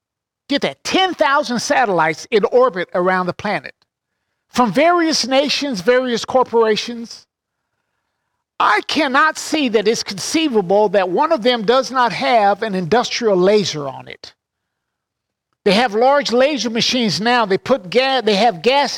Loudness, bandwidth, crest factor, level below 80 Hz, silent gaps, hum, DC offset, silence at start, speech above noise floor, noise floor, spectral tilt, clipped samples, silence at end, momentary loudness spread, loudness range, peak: -16 LUFS; 16.5 kHz; 14 dB; -58 dBFS; none; none; under 0.1%; 0.5 s; 63 dB; -79 dBFS; -3.5 dB/octave; under 0.1%; 0 s; 7 LU; 3 LU; -4 dBFS